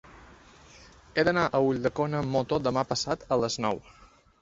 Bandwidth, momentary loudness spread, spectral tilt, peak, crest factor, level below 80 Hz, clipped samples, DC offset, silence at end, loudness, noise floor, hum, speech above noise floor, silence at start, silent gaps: 8 kHz; 6 LU; -5 dB/octave; -10 dBFS; 18 dB; -56 dBFS; under 0.1%; under 0.1%; 0.35 s; -28 LUFS; -53 dBFS; none; 26 dB; 0.05 s; none